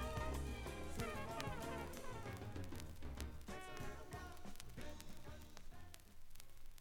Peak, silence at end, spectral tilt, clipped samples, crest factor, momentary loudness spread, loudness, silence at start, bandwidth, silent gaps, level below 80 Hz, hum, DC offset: -24 dBFS; 0 s; -5 dB/octave; under 0.1%; 24 dB; 14 LU; -50 LUFS; 0 s; 17.5 kHz; none; -54 dBFS; none; under 0.1%